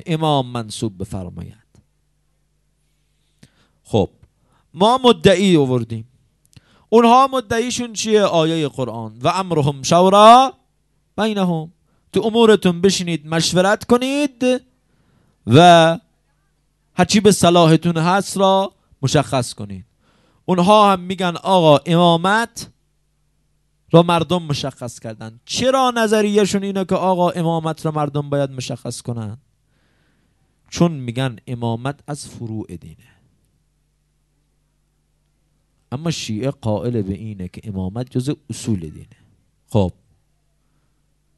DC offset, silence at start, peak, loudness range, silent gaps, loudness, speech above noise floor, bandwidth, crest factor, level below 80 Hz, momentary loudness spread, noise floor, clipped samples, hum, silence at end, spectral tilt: under 0.1%; 0.05 s; 0 dBFS; 13 LU; none; -16 LUFS; 48 dB; 12 kHz; 18 dB; -52 dBFS; 18 LU; -64 dBFS; under 0.1%; none; 1.5 s; -5.5 dB/octave